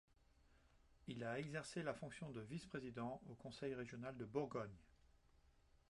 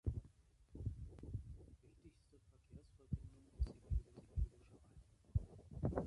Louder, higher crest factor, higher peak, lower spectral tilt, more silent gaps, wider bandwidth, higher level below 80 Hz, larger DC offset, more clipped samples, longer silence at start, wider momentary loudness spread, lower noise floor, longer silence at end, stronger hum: about the same, -50 LUFS vs -48 LUFS; about the same, 20 dB vs 22 dB; second, -30 dBFS vs -26 dBFS; second, -6 dB/octave vs -9.5 dB/octave; neither; about the same, 11 kHz vs 11 kHz; second, -74 dBFS vs -50 dBFS; neither; neither; first, 0.4 s vs 0.05 s; second, 9 LU vs 21 LU; first, -74 dBFS vs -70 dBFS; first, 0.4 s vs 0 s; neither